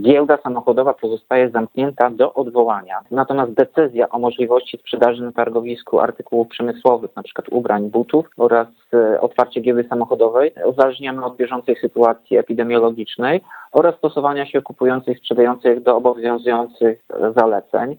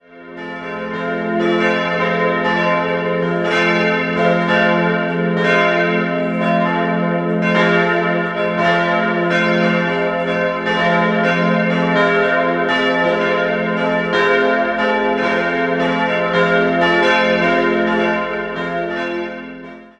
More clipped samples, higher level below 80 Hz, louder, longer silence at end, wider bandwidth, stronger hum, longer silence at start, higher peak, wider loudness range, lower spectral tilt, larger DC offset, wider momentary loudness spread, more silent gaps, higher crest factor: neither; second, -64 dBFS vs -50 dBFS; about the same, -17 LUFS vs -16 LUFS; about the same, 0.05 s vs 0.1 s; first, 19 kHz vs 8.6 kHz; neither; about the same, 0 s vs 0.1 s; about the same, 0 dBFS vs -2 dBFS; about the same, 2 LU vs 1 LU; first, -8 dB/octave vs -6.5 dB/octave; neither; about the same, 7 LU vs 7 LU; neither; about the same, 16 dB vs 16 dB